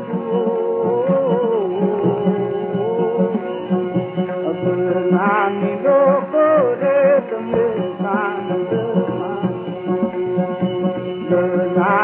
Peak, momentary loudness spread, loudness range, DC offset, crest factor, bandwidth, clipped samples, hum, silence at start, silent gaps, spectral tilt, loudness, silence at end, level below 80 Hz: -4 dBFS; 7 LU; 5 LU; under 0.1%; 14 dB; 3.7 kHz; under 0.1%; none; 0 s; none; -12 dB/octave; -18 LUFS; 0 s; -62 dBFS